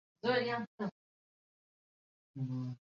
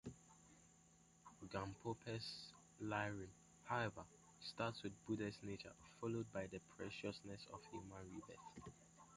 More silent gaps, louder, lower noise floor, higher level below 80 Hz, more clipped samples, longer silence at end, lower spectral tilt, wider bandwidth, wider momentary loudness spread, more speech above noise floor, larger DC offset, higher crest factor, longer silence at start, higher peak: first, 0.67-0.78 s, 0.91-2.34 s vs none; first, -38 LUFS vs -50 LUFS; first, under -90 dBFS vs -72 dBFS; second, -80 dBFS vs -74 dBFS; neither; first, 0.15 s vs 0 s; about the same, -4.5 dB/octave vs -5 dB/octave; second, 7.2 kHz vs 11 kHz; second, 10 LU vs 19 LU; first, over 53 dB vs 22 dB; neither; about the same, 20 dB vs 22 dB; first, 0.25 s vs 0.05 s; first, -20 dBFS vs -28 dBFS